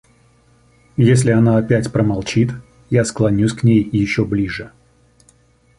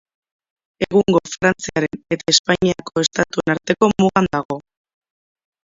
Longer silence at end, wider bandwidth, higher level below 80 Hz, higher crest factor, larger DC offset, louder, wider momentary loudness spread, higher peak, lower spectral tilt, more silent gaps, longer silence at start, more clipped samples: about the same, 1.1 s vs 1.1 s; first, 11.5 kHz vs 7.8 kHz; first, -42 dBFS vs -50 dBFS; about the same, 16 dB vs 20 dB; neither; about the same, -16 LUFS vs -18 LUFS; about the same, 11 LU vs 9 LU; about the same, -2 dBFS vs 0 dBFS; first, -7 dB/octave vs -4 dB/octave; second, none vs 2.39-2.44 s, 4.45-4.49 s; first, 1 s vs 0.8 s; neither